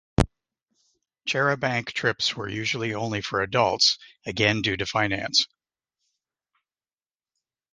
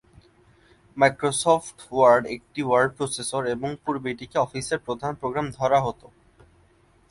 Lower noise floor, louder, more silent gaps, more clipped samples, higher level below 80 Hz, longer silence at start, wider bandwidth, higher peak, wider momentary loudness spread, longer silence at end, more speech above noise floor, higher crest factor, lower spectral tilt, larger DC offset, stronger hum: first, under -90 dBFS vs -59 dBFS; about the same, -24 LUFS vs -24 LUFS; neither; neither; first, -44 dBFS vs -58 dBFS; second, 0.2 s vs 0.95 s; about the same, 11.5 kHz vs 11.5 kHz; about the same, -2 dBFS vs -4 dBFS; second, 8 LU vs 11 LU; first, 2.25 s vs 1.2 s; first, over 65 dB vs 36 dB; about the same, 24 dB vs 20 dB; about the same, -3.5 dB/octave vs -4.5 dB/octave; neither; neither